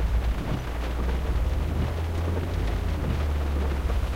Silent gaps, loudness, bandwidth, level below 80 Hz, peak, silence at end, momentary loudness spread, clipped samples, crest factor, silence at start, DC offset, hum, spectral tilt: none; -28 LUFS; 16 kHz; -28 dBFS; -14 dBFS; 0 s; 2 LU; under 0.1%; 12 dB; 0 s; under 0.1%; none; -7 dB/octave